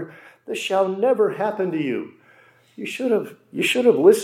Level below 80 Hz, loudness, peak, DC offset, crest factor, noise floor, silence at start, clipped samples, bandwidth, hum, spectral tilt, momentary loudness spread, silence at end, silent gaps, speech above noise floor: -80 dBFS; -21 LUFS; -2 dBFS; under 0.1%; 18 dB; -54 dBFS; 0 s; under 0.1%; 16 kHz; none; -4.5 dB/octave; 16 LU; 0 s; none; 34 dB